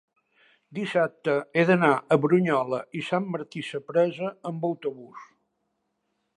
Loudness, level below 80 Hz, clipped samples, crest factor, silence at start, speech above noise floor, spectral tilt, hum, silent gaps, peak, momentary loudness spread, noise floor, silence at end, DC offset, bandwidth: -25 LUFS; -76 dBFS; under 0.1%; 22 dB; 0.7 s; 52 dB; -7 dB/octave; none; none; -6 dBFS; 13 LU; -77 dBFS; 1.15 s; under 0.1%; 11 kHz